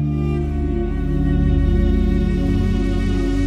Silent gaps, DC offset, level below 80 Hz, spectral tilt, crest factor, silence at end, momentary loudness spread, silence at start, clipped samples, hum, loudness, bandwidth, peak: none; under 0.1%; -20 dBFS; -8.5 dB/octave; 12 dB; 0 s; 4 LU; 0 s; under 0.1%; none; -20 LUFS; 8 kHz; -6 dBFS